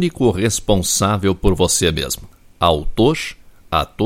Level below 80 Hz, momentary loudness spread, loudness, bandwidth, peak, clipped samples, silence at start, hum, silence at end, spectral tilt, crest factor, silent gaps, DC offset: -30 dBFS; 8 LU; -17 LUFS; 16.5 kHz; 0 dBFS; under 0.1%; 0 s; none; 0 s; -4 dB/octave; 18 dB; none; under 0.1%